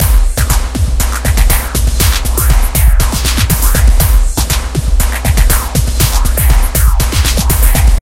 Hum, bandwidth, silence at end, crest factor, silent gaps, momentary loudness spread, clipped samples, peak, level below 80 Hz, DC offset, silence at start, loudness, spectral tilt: none; 17 kHz; 0 s; 8 dB; none; 4 LU; 0.1%; 0 dBFS; -10 dBFS; under 0.1%; 0 s; -12 LUFS; -4 dB/octave